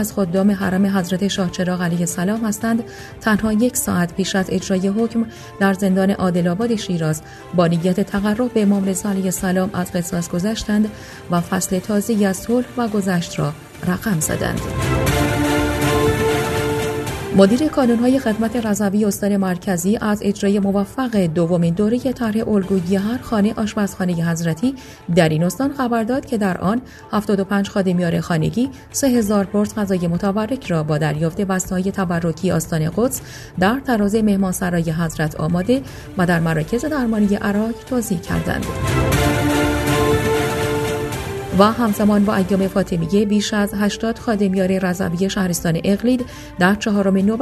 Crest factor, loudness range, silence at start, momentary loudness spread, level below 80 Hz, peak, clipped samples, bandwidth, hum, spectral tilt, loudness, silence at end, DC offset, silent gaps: 18 dB; 3 LU; 0 s; 5 LU; -38 dBFS; 0 dBFS; under 0.1%; 14 kHz; none; -5.5 dB/octave; -19 LUFS; 0 s; under 0.1%; none